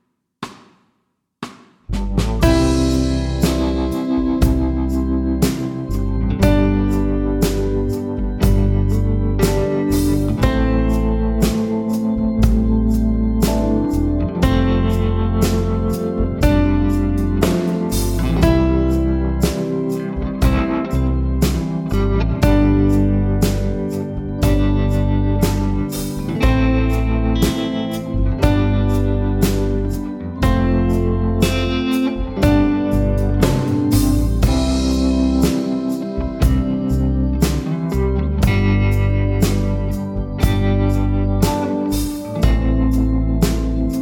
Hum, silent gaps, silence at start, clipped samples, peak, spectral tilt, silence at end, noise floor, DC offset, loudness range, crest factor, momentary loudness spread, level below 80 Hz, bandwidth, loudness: none; none; 0.4 s; under 0.1%; 0 dBFS; -7 dB/octave; 0 s; -69 dBFS; under 0.1%; 2 LU; 16 dB; 6 LU; -22 dBFS; 18 kHz; -18 LUFS